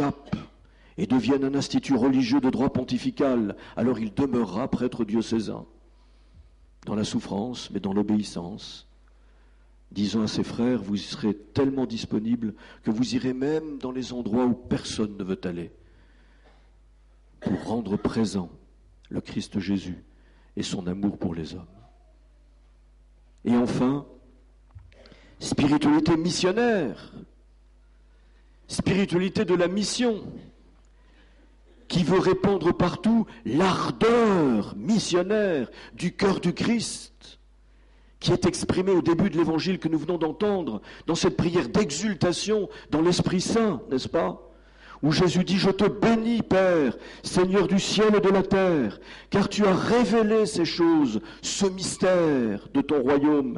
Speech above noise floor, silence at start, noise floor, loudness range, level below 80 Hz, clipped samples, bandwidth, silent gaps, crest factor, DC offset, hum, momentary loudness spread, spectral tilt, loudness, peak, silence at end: 31 dB; 0 s; -55 dBFS; 8 LU; -50 dBFS; under 0.1%; 11.5 kHz; none; 12 dB; under 0.1%; none; 12 LU; -5.5 dB/octave; -25 LUFS; -14 dBFS; 0 s